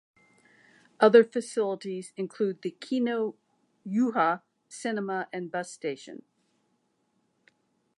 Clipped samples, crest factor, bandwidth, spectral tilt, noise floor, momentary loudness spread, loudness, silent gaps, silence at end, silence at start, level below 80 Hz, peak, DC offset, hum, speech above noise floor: under 0.1%; 24 dB; 11 kHz; -5.5 dB/octave; -74 dBFS; 17 LU; -28 LUFS; none; 1.8 s; 1 s; -86 dBFS; -6 dBFS; under 0.1%; none; 47 dB